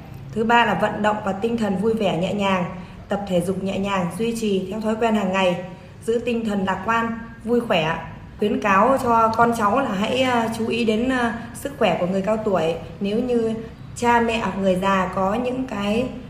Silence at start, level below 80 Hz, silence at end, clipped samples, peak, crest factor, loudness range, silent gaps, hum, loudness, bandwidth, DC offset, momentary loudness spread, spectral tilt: 0 s; -46 dBFS; 0 s; under 0.1%; -2 dBFS; 18 dB; 3 LU; none; none; -21 LUFS; 14.5 kHz; under 0.1%; 10 LU; -5.5 dB/octave